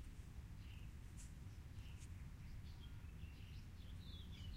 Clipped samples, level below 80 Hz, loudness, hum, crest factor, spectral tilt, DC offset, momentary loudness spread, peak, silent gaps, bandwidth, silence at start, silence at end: under 0.1%; -56 dBFS; -57 LUFS; none; 12 dB; -5 dB/octave; under 0.1%; 2 LU; -42 dBFS; none; 16 kHz; 0 s; 0 s